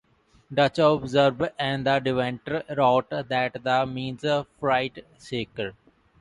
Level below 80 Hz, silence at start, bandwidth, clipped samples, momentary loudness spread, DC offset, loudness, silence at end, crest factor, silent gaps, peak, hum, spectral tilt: -58 dBFS; 0.5 s; 11 kHz; under 0.1%; 12 LU; under 0.1%; -25 LUFS; 0.5 s; 20 dB; none; -6 dBFS; none; -6 dB/octave